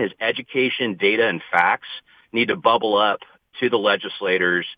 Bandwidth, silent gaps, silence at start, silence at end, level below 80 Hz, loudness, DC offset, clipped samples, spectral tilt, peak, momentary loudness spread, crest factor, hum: 5.2 kHz; none; 0 s; 0.05 s; -68 dBFS; -20 LUFS; under 0.1%; under 0.1%; -6.5 dB/octave; -2 dBFS; 9 LU; 18 dB; none